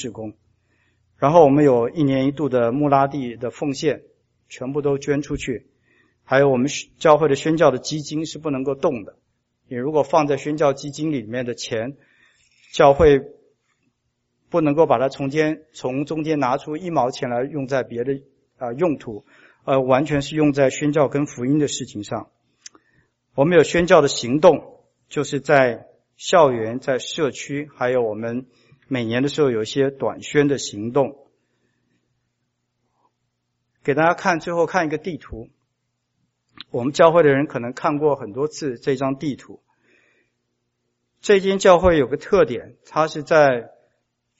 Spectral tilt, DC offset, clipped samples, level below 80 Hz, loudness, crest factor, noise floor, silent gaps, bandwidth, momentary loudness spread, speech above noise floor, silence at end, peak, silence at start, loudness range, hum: -5 dB/octave; under 0.1%; under 0.1%; -48 dBFS; -20 LUFS; 20 dB; -74 dBFS; none; 8 kHz; 14 LU; 55 dB; 0.7 s; 0 dBFS; 0 s; 6 LU; none